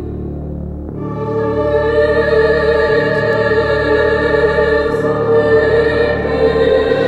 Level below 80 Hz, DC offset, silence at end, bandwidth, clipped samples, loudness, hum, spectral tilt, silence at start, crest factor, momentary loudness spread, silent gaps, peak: -30 dBFS; under 0.1%; 0 s; 8.2 kHz; under 0.1%; -13 LUFS; none; -7.5 dB/octave; 0 s; 12 dB; 12 LU; none; -2 dBFS